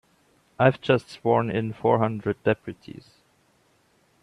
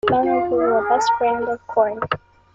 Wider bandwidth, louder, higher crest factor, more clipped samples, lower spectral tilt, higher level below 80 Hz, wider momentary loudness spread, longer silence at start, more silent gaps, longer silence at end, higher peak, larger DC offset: first, 11 kHz vs 9 kHz; second, -24 LUFS vs -20 LUFS; about the same, 20 dB vs 16 dB; neither; first, -8 dB/octave vs -5 dB/octave; second, -62 dBFS vs -54 dBFS; first, 19 LU vs 8 LU; first, 0.6 s vs 0.05 s; neither; first, 1.3 s vs 0.4 s; second, -6 dBFS vs -2 dBFS; neither